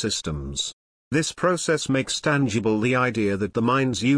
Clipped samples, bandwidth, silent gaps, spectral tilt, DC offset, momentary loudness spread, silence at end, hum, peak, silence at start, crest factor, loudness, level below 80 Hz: under 0.1%; 10.5 kHz; 0.73-1.11 s; -4.5 dB/octave; under 0.1%; 6 LU; 0 s; none; -8 dBFS; 0 s; 16 dB; -23 LUFS; -46 dBFS